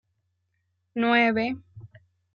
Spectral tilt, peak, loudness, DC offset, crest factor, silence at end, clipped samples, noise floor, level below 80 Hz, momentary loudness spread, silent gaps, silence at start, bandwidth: -6.5 dB/octave; -8 dBFS; -23 LUFS; under 0.1%; 20 dB; 0.5 s; under 0.1%; -75 dBFS; -68 dBFS; 16 LU; none; 0.95 s; 6.6 kHz